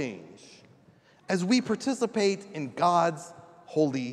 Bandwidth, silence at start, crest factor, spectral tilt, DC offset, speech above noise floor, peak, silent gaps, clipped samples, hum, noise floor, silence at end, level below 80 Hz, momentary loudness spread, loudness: 12 kHz; 0 s; 18 dB; -5 dB/octave; under 0.1%; 32 dB; -12 dBFS; none; under 0.1%; none; -59 dBFS; 0 s; -78 dBFS; 14 LU; -27 LUFS